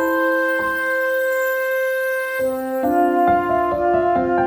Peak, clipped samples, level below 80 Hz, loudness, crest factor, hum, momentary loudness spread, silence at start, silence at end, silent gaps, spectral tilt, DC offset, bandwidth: -6 dBFS; under 0.1%; -50 dBFS; -19 LUFS; 12 dB; none; 5 LU; 0 s; 0 s; none; -5.5 dB/octave; under 0.1%; over 20 kHz